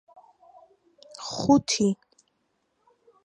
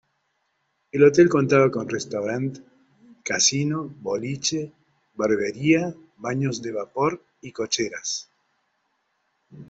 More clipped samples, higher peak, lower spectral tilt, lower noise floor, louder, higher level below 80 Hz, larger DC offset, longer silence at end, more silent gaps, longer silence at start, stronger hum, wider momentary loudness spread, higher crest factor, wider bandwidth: neither; second, -8 dBFS vs -4 dBFS; about the same, -4.5 dB/octave vs -4 dB/octave; about the same, -74 dBFS vs -72 dBFS; about the same, -24 LUFS vs -23 LUFS; about the same, -62 dBFS vs -64 dBFS; neither; first, 1.3 s vs 0.05 s; neither; first, 1.2 s vs 0.95 s; neither; first, 18 LU vs 15 LU; about the same, 22 dB vs 20 dB; first, 11 kHz vs 8 kHz